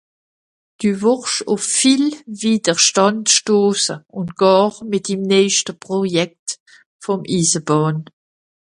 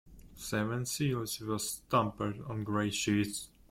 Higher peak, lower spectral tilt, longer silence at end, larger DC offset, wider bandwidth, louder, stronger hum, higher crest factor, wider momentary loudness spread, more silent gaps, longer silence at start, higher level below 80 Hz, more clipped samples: first, 0 dBFS vs -16 dBFS; about the same, -3.5 dB/octave vs -4.5 dB/octave; first, 0.65 s vs 0.25 s; neither; second, 11.5 kHz vs 16.5 kHz; first, -16 LUFS vs -34 LUFS; neither; about the same, 18 dB vs 18 dB; first, 11 LU vs 7 LU; first, 6.39-6.46 s, 6.60-6.66 s, 6.86-7.00 s vs none; first, 0.8 s vs 0.05 s; about the same, -62 dBFS vs -60 dBFS; neither